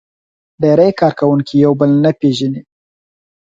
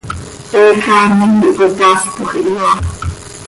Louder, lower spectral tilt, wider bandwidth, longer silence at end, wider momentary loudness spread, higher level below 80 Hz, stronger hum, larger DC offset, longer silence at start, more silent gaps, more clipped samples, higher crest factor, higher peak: about the same, -13 LUFS vs -11 LUFS; first, -8 dB/octave vs -5 dB/octave; second, 7.8 kHz vs 11.5 kHz; first, 0.8 s vs 0 s; second, 8 LU vs 15 LU; second, -54 dBFS vs -32 dBFS; neither; neither; first, 0.6 s vs 0.05 s; neither; neither; about the same, 14 dB vs 12 dB; about the same, 0 dBFS vs 0 dBFS